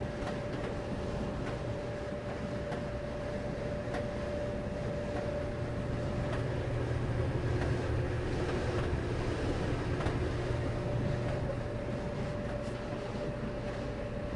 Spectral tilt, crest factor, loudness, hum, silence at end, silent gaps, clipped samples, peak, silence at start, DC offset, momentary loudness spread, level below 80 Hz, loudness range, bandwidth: -7 dB/octave; 16 dB; -36 LUFS; none; 0 s; none; under 0.1%; -18 dBFS; 0 s; under 0.1%; 5 LU; -44 dBFS; 4 LU; 11 kHz